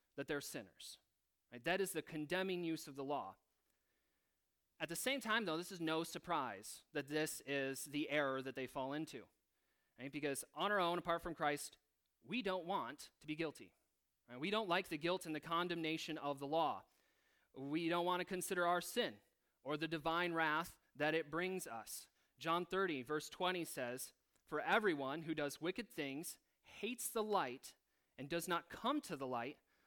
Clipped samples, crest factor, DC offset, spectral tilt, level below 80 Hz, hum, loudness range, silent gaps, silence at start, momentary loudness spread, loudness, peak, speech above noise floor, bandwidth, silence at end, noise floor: under 0.1%; 22 dB; under 0.1%; -3.5 dB/octave; -76 dBFS; none; 4 LU; none; 0.15 s; 13 LU; -42 LUFS; -20 dBFS; 45 dB; 19 kHz; 0.35 s; -87 dBFS